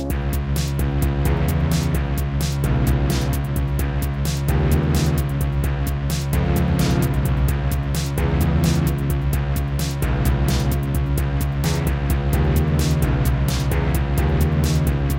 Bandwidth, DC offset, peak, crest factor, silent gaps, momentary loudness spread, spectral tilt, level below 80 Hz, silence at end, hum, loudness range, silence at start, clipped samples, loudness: 17 kHz; under 0.1%; -6 dBFS; 12 dB; none; 4 LU; -6.5 dB/octave; -24 dBFS; 0 s; none; 1 LU; 0 s; under 0.1%; -21 LUFS